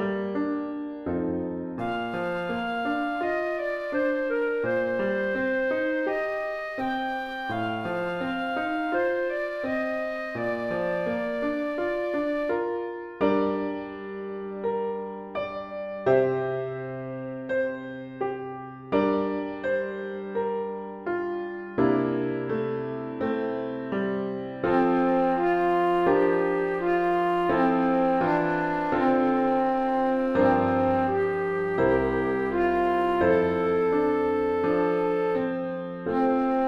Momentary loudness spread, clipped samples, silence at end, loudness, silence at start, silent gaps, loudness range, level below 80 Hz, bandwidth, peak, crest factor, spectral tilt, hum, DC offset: 10 LU; under 0.1%; 0 s; -26 LUFS; 0 s; none; 6 LU; -54 dBFS; 11 kHz; -10 dBFS; 16 dB; -8 dB/octave; none; under 0.1%